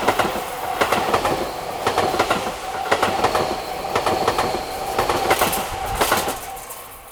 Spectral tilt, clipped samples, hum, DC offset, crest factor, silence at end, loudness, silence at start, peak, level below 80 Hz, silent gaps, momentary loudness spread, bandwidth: -3 dB/octave; under 0.1%; none; under 0.1%; 20 dB; 0 s; -21 LUFS; 0 s; -2 dBFS; -42 dBFS; none; 8 LU; over 20 kHz